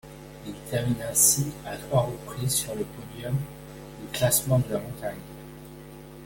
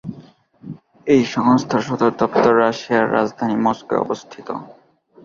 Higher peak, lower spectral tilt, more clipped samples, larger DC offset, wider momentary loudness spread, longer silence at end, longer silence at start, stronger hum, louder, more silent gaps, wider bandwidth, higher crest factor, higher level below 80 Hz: second, -6 dBFS vs -2 dBFS; second, -4 dB/octave vs -6 dB/octave; neither; neither; first, 24 LU vs 16 LU; second, 0 s vs 0.5 s; about the same, 0.05 s vs 0.05 s; neither; second, -25 LUFS vs -18 LUFS; neither; first, 17 kHz vs 7.4 kHz; first, 24 dB vs 18 dB; first, -50 dBFS vs -58 dBFS